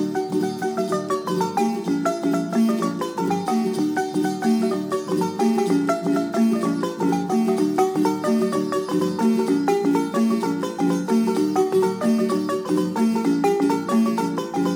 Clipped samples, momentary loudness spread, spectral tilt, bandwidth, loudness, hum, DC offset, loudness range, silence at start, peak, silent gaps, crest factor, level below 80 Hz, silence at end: under 0.1%; 4 LU; -6 dB/octave; 19 kHz; -22 LUFS; none; under 0.1%; 2 LU; 0 s; -6 dBFS; none; 14 dB; -72 dBFS; 0 s